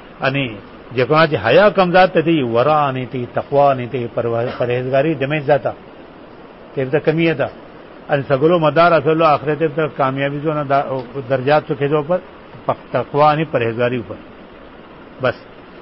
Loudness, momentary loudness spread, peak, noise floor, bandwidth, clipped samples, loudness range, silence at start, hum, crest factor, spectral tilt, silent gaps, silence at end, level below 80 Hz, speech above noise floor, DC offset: -16 LUFS; 12 LU; -2 dBFS; -39 dBFS; 5.8 kHz; under 0.1%; 5 LU; 0 s; none; 14 dB; -11 dB/octave; none; 0 s; -50 dBFS; 23 dB; 0.1%